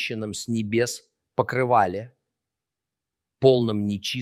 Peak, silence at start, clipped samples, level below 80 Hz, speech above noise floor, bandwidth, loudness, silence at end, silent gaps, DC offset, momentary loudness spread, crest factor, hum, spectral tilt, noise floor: -4 dBFS; 0 s; under 0.1%; -64 dBFS; 64 dB; 15.5 kHz; -23 LUFS; 0 s; none; under 0.1%; 11 LU; 20 dB; none; -5.5 dB/octave; -87 dBFS